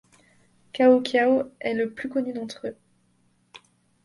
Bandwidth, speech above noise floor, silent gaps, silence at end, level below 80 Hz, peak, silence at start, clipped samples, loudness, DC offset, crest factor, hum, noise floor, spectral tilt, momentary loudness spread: 11.5 kHz; 43 dB; none; 0.5 s; -70 dBFS; -6 dBFS; 0.75 s; under 0.1%; -23 LUFS; under 0.1%; 20 dB; none; -65 dBFS; -5 dB/octave; 17 LU